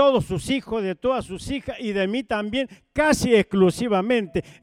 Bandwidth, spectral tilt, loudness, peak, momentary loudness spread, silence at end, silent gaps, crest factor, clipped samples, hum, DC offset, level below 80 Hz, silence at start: 16 kHz; -5.5 dB/octave; -23 LUFS; -6 dBFS; 10 LU; 0.1 s; none; 16 dB; under 0.1%; none; under 0.1%; -46 dBFS; 0 s